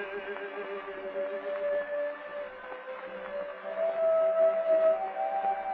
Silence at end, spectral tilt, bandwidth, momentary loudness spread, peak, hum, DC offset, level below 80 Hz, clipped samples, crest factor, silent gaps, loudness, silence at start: 0 s; -1.5 dB/octave; 4.5 kHz; 15 LU; -16 dBFS; none; under 0.1%; -72 dBFS; under 0.1%; 14 dB; none; -31 LUFS; 0 s